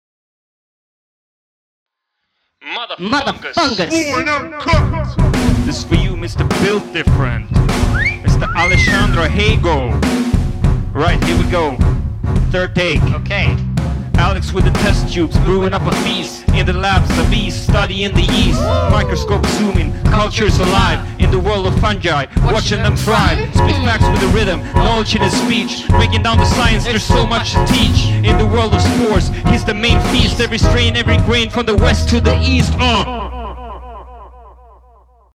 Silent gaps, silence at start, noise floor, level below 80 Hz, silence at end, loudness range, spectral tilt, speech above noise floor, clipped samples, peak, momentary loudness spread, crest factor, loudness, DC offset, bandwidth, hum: none; 2.65 s; -72 dBFS; -20 dBFS; 0.85 s; 3 LU; -5.5 dB/octave; 59 dB; under 0.1%; 0 dBFS; 5 LU; 14 dB; -14 LUFS; under 0.1%; 14.5 kHz; none